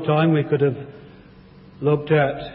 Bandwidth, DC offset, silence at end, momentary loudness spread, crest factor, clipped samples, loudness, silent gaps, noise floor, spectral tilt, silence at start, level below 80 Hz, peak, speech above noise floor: 4.6 kHz; under 0.1%; 0 s; 12 LU; 14 dB; under 0.1%; -20 LUFS; none; -46 dBFS; -12.5 dB/octave; 0 s; -54 dBFS; -6 dBFS; 26 dB